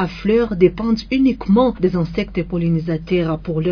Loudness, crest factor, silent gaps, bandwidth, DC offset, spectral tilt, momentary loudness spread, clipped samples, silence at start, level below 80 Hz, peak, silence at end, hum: -18 LUFS; 16 dB; none; 5.4 kHz; under 0.1%; -8.5 dB/octave; 6 LU; under 0.1%; 0 s; -36 dBFS; -2 dBFS; 0 s; none